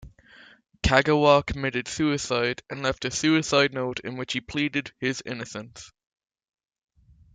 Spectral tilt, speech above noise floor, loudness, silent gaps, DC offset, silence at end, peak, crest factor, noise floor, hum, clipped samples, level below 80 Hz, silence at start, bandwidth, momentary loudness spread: -4.5 dB/octave; 29 dB; -24 LUFS; none; under 0.1%; 1.45 s; -4 dBFS; 22 dB; -53 dBFS; none; under 0.1%; -44 dBFS; 0 s; 9.4 kHz; 14 LU